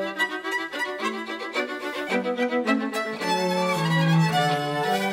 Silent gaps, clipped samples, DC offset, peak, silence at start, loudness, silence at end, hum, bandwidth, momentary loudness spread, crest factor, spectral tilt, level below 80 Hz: none; under 0.1%; under 0.1%; -10 dBFS; 0 s; -25 LUFS; 0 s; none; 16 kHz; 8 LU; 14 dB; -5.5 dB/octave; -70 dBFS